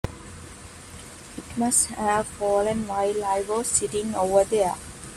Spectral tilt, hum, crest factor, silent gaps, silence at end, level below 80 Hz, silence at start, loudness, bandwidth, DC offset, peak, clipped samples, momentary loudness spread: -3.5 dB/octave; none; 18 dB; none; 0 s; -48 dBFS; 0.05 s; -23 LUFS; 14.5 kHz; under 0.1%; -6 dBFS; under 0.1%; 20 LU